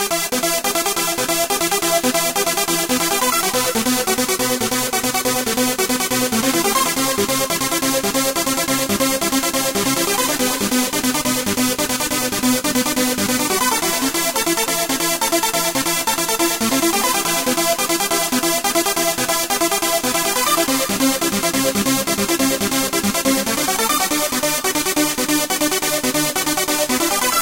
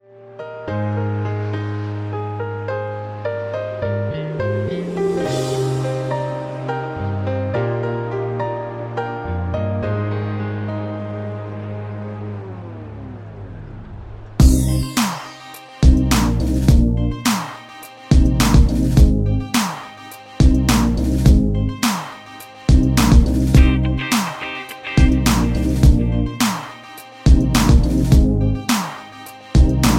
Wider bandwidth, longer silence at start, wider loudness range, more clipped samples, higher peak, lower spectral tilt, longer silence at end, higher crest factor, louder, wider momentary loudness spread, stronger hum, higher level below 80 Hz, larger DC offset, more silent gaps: about the same, 17 kHz vs 16.5 kHz; second, 0 s vs 0.2 s; second, 1 LU vs 8 LU; neither; about the same, -2 dBFS vs 0 dBFS; second, -2 dB/octave vs -6 dB/octave; about the same, 0 s vs 0 s; about the same, 16 dB vs 18 dB; about the same, -17 LUFS vs -19 LUFS; second, 2 LU vs 19 LU; neither; second, -48 dBFS vs -20 dBFS; first, 0.2% vs under 0.1%; neither